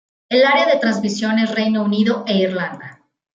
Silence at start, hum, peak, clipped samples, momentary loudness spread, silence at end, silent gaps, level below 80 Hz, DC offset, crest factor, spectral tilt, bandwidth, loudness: 0.3 s; none; -4 dBFS; under 0.1%; 9 LU; 0.45 s; none; -66 dBFS; under 0.1%; 14 dB; -5.5 dB/octave; 7.8 kHz; -17 LUFS